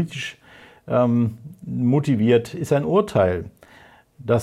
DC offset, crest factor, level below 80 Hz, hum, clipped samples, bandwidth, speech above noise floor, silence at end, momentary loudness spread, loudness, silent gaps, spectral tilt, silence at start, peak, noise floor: under 0.1%; 16 dB; -56 dBFS; none; under 0.1%; 13.5 kHz; 30 dB; 0 s; 14 LU; -21 LUFS; none; -7.5 dB/octave; 0 s; -6 dBFS; -50 dBFS